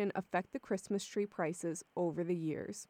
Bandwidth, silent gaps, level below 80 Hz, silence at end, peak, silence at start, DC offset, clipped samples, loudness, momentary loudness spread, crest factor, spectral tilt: 16 kHz; none; -78 dBFS; 0.05 s; -20 dBFS; 0 s; under 0.1%; under 0.1%; -38 LUFS; 4 LU; 18 dB; -5.5 dB/octave